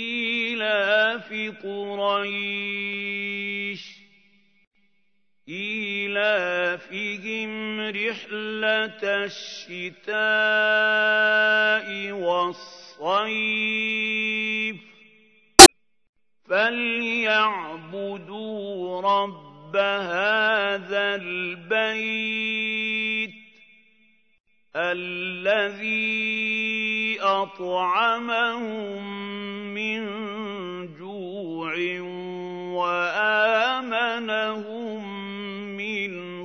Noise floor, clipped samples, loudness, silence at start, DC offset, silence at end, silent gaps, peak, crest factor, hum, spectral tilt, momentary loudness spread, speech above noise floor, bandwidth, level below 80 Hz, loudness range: -74 dBFS; 0.2%; -21 LUFS; 0 s; under 0.1%; 0 s; 4.67-4.71 s, 16.09-16.13 s, 24.40-24.44 s; 0 dBFS; 24 dB; none; -1.5 dB/octave; 13 LU; 49 dB; 11 kHz; -52 dBFS; 14 LU